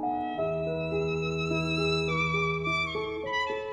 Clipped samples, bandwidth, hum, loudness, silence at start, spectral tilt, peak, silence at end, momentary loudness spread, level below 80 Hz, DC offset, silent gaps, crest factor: under 0.1%; 9.8 kHz; none; -29 LUFS; 0 s; -5.5 dB/octave; -16 dBFS; 0 s; 4 LU; -50 dBFS; under 0.1%; none; 12 dB